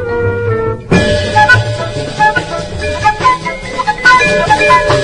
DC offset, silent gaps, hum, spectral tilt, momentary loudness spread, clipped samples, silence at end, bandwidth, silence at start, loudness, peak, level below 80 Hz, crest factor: under 0.1%; none; none; -4.5 dB/octave; 11 LU; 0.3%; 0 s; 11 kHz; 0 s; -11 LUFS; 0 dBFS; -30 dBFS; 10 dB